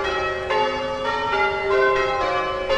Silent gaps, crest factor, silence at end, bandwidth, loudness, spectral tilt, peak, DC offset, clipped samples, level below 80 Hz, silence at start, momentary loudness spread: none; 14 dB; 0 s; 9.6 kHz; -21 LUFS; -4 dB/octave; -8 dBFS; under 0.1%; under 0.1%; -44 dBFS; 0 s; 5 LU